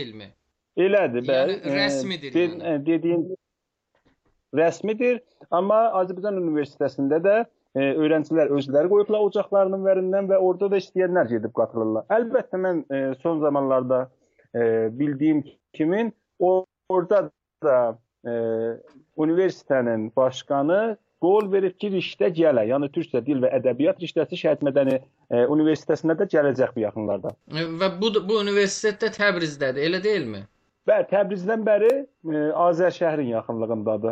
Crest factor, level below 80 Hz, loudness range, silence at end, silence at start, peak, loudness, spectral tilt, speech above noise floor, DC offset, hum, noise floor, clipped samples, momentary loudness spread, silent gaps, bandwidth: 16 dB; -70 dBFS; 3 LU; 0 s; 0 s; -8 dBFS; -23 LUFS; -6 dB/octave; 59 dB; under 0.1%; none; -81 dBFS; under 0.1%; 7 LU; none; 8.8 kHz